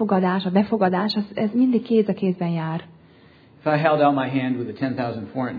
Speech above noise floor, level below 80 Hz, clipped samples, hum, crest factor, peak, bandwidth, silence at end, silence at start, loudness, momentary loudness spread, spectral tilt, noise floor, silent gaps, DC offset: 30 dB; -64 dBFS; under 0.1%; none; 18 dB; -4 dBFS; 5 kHz; 0 s; 0 s; -22 LUFS; 9 LU; -9.5 dB/octave; -51 dBFS; none; under 0.1%